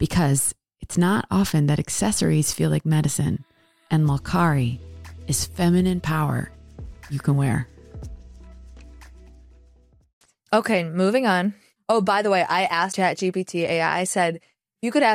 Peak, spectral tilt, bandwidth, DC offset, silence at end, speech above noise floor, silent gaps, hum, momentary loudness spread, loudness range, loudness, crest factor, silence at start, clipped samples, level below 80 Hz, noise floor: -8 dBFS; -5 dB/octave; 16 kHz; under 0.1%; 0 s; 34 dB; 10.13-10.21 s; none; 17 LU; 8 LU; -22 LUFS; 16 dB; 0 s; under 0.1%; -46 dBFS; -55 dBFS